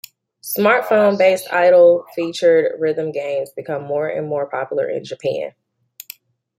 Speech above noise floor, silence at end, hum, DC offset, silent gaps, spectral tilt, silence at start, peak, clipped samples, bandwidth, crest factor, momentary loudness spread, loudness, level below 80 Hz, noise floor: 27 dB; 1.1 s; none; under 0.1%; none; -5 dB/octave; 0.45 s; -2 dBFS; under 0.1%; 16.5 kHz; 16 dB; 14 LU; -17 LUFS; -70 dBFS; -44 dBFS